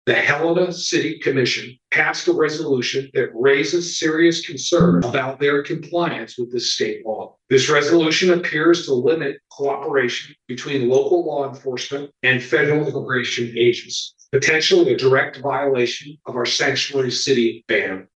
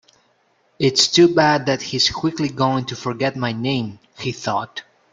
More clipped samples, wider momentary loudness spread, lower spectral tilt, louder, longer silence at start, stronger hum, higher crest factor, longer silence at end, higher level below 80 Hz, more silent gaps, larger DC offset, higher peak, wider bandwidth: neither; second, 10 LU vs 15 LU; about the same, -4 dB/octave vs -4 dB/octave; about the same, -19 LUFS vs -19 LUFS; second, 0.05 s vs 0.8 s; neither; about the same, 18 dB vs 18 dB; second, 0.15 s vs 0.3 s; about the same, -56 dBFS vs -56 dBFS; neither; neither; about the same, -2 dBFS vs -2 dBFS; about the same, 8.6 kHz vs 9.4 kHz